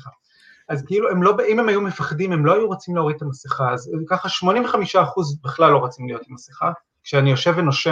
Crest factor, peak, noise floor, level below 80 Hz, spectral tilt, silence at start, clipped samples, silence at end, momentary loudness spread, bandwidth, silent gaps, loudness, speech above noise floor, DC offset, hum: 18 dB; -2 dBFS; -53 dBFS; -64 dBFS; -6 dB/octave; 0.05 s; under 0.1%; 0 s; 12 LU; 7.6 kHz; none; -19 LUFS; 34 dB; under 0.1%; none